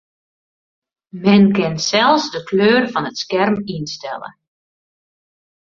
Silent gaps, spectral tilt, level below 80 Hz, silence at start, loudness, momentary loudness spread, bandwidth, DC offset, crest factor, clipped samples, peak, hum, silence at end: none; -5 dB/octave; -58 dBFS; 1.15 s; -16 LUFS; 15 LU; 7.4 kHz; under 0.1%; 16 dB; under 0.1%; -2 dBFS; none; 1.35 s